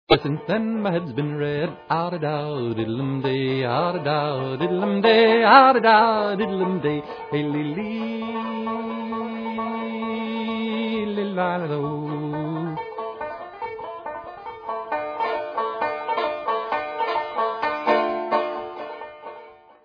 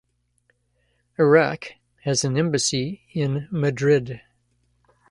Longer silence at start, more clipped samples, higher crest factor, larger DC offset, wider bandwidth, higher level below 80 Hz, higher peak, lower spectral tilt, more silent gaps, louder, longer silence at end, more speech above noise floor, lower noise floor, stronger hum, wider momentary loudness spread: second, 0.1 s vs 1.2 s; neither; about the same, 22 dB vs 20 dB; neither; second, 5.4 kHz vs 11.5 kHz; about the same, -58 dBFS vs -58 dBFS; first, 0 dBFS vs -4 dBFS; first, -8.5 dB/octave vs -5 dB/octave; neither; about the same, -23 LUFS vs -22 LUFS; second, 0.3 s vs 0.95 s; second, 24 dB vs 47 dB; second, -45 dBFS vs -68 dBFS; second, none vs 60 Hz at -60 dBFS; about the same, 16 LU vs 18 LU